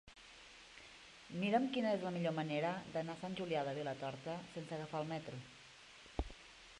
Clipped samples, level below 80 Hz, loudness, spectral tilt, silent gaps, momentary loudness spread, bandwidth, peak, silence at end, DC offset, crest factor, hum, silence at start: under 0.1%; -60 dBFS; -41 LUFS; -6 dB/octave; none; 20 LU; 11 kHz; -22 dBFS; 0 s; under 0.1%; 20 dB; none; 0.05 s